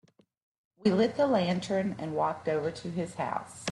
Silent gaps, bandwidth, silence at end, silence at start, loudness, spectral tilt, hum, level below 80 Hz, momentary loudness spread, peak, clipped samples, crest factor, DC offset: none; 11.5 kHz; 0 s; 0.8 s; -30 LUFS; -6 dB/octave; none; -68 dBFS; 8 LU; -12 dBFS; under 0.1%; 18 dB; under 0.1%